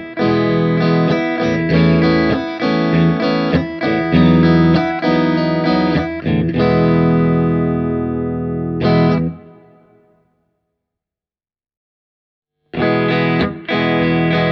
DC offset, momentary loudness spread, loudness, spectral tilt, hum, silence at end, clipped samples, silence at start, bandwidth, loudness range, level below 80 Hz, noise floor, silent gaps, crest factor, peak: under 0.1%; 6 LU; -15 LUFS; -8.5 dB/octave; none; 0 s; under 0.1%; 0 s; 6 kHz; 8 LU; -38 dBFS; under -90 dBFS; 11.77-12.42 s; 16 dB; 0 dBFS